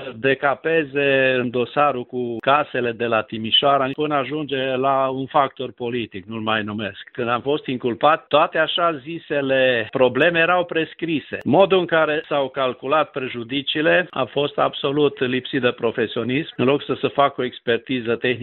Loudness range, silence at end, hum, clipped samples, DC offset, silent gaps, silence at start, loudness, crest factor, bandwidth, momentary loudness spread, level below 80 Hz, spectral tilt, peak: 4 LU; 0 s; none; under 0.1%; under 0.1%; none; 0 s; -20 LUFS; 18 dB; 4.3 kHz; 9 LU; -62 dBFS; -2.5 dB/octave; -2 dBFS